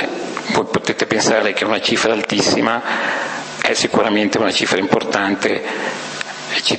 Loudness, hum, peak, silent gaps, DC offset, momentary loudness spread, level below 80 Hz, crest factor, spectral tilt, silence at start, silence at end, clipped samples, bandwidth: -17 LUFS; none; 0 dBFS; none; under 0.1%; 8 LU; -56 dBFS; 18 dB; -3 dB/octave; 0 s; 0 s; under 0.1%; 8.8 kHz